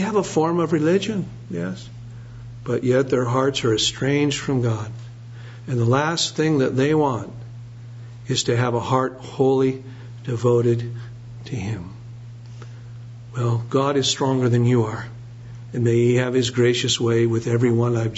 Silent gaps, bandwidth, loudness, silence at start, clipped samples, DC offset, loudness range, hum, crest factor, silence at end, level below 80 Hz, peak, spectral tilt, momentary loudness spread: none; 8 kHz; -21 LUFS; 0 s; under 0.1%; under 0.1%; 5 LU; none; 18 dB; 0 s; -52 dBFS; -4 dBFS; -5.5 dB/octave; 20 LU